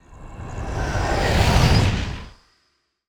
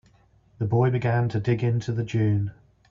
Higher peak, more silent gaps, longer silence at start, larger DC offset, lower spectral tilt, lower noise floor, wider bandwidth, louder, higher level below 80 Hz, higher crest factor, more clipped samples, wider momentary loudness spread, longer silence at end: first, -4 dBFS vs -10 dBFS; neither; second, 0.1 s vs 0.6 s; neither; second, -5.5 dB/octave vs -8.5 dB/octave; first, -68 dBFS vs -59 dBFS; first, over 20 kHz vs 7.2 kHz; first, -20 LUFS vs -25 LUFS; first, -28 dBFS vs -54 dBFS; about the same, 18 dB vs 14 dB; neither; first, 20 LU vs 5 LU; first, 0.8 s vs 0.4 s